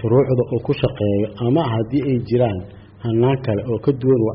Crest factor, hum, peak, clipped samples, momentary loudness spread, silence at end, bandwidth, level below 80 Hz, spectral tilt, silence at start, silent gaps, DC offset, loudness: 12 dB; none; -6 dBFS; under 0.1%; 5 LU; 0 s; 5.4 kHz; -46 dBFS; -8 dB/octave; 0 s; none; under 0.1%; -19 LUFS